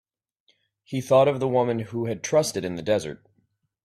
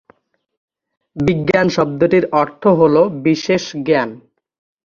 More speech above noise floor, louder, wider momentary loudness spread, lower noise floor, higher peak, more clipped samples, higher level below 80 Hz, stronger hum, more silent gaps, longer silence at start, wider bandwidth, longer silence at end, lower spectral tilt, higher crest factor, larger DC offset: first, 47 dB vs 40 dB; second, -24 LUFS vs -15 LUFS; first, 13 LU vs 6 LU; first, -70 dBFS vs -54 dBFS; second, -6 dBFS vs 0 dBFS; neither; second, -62 dBFS vs -50 dBFS; neither; neither; second, 0.9 s vs 1.15 s; first, 14.5 kHz vs 7.4 kHz; about the same, 0.7 s vs 0.65 s; about the same, -5.5 dB/octave vs -6.5 dB/octave; about the same, 18 dB vs 16 dB; neither